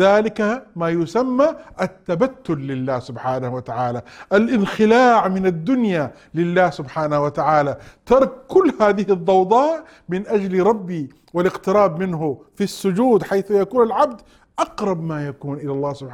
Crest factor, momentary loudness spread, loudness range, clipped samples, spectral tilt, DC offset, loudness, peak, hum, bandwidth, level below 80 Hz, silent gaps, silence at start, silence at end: 16 dB; 11 LU; 4 LU; under 0.1%; -7 dB/octave; under 0.1%; -19 LUFS; -2 dBFS; none; 14 kHz; -52 dBFS; none; 0 s; 0 s